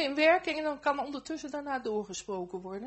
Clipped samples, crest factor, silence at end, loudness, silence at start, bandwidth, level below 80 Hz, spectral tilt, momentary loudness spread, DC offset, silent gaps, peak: under 0.1%; 20 dB; 0 s; -32 LUFS; 0 s; 8.2 kHz; -66 dBFS; -3.5 dB/octave; 13 LU; under 0.1%; none; -12 dBFS